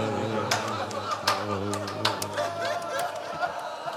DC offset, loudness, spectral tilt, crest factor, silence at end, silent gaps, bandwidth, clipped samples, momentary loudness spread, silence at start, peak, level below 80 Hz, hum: under 0.1%; -29 LUFS; -3.5 dB/octave; 22 dB; 0 s; none; 16 kHz; under 0.1%; 5 LU; 0 s; -6 dBFS; -70 dBFS; none